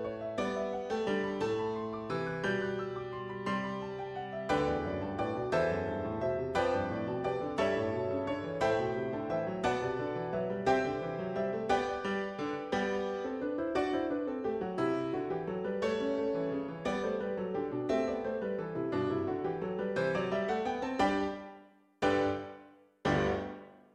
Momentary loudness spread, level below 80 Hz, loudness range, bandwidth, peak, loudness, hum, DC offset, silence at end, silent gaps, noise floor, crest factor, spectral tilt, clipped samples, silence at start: 6 LU; -60 dBFS; 2 LU; 10.5 kHz; -16 dBFS; -34 LUFS; none; under 0.1%; 0.15 s; none; -58 dBFS; 18 dB; -6.5 dB/octave; under 0.1%; 0 s